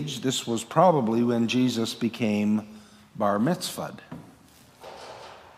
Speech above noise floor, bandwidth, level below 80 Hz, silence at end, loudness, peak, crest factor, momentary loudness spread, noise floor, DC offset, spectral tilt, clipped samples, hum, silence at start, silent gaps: 30 dB; 15.5 kHz; -68 dBFS; 0.15 s; -25 LUFS; -6 dBFS; 22 dB; 23 LU; -54 dBFS; under 0.1%; -5.5 dB/octave; under 0.1%; none; 0 s; none